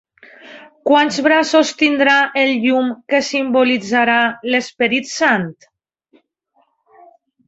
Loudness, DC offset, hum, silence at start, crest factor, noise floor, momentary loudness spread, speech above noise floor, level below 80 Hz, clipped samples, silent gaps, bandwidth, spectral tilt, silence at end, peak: -15 LUFS; under 0.1%; none; 0.45 s; 16 dB; -62 dBFS; 6 LU; 47 dB; -62 dBFS; under 0.1%; none; 8 kHz; -3.5 dB/octave; 1.95 s; -2 dBFS